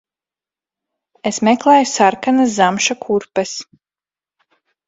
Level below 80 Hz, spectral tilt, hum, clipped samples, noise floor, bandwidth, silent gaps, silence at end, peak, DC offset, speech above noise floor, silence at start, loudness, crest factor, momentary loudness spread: -62 dBFS; -3.5 dB/octave; none; under 0.1%; under -90 dBFS; 8 kHz; none; 1.25 s; 0 dBFS; under 0.1%; over 75 dB; 1.25 s; -15 LUFS; 18 dB; 12 LU